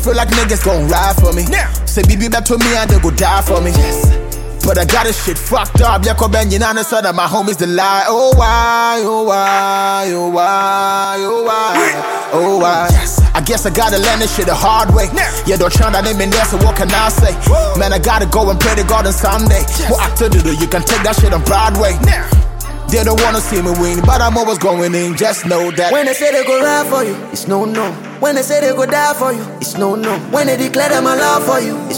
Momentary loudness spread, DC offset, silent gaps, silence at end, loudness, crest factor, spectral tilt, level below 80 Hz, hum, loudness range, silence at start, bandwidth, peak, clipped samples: 4 LU; under 0.1%; none; 0 s; -12 LUFS; 12 dB; -4.5 dB/octave; -18 dBFS; none; 2 LU; 0 s; 17 kHz; 0 dBFS; under 0.1%